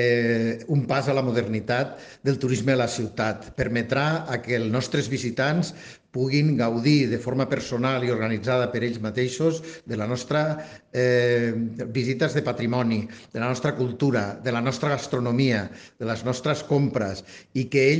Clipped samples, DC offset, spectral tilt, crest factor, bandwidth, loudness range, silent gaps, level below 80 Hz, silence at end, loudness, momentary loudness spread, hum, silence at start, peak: under 0.1%; under 0.1%; -6 dB/octave; 18 dB; 9.8 kHz; 2 LU; none; -56 dBFS; 0 s; -25 LUFS; 8 LU; none; 0 s; -8 dBFS